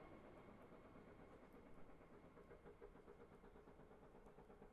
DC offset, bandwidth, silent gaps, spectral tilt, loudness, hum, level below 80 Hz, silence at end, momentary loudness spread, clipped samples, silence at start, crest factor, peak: under 0.1%; 5.2 kHz; none; -6 dB/octave; -65 LUFS; none; -74 dBFS; 0 s; 3 LU; under 0.1%; 0 s; 14 dB; -48 dBFS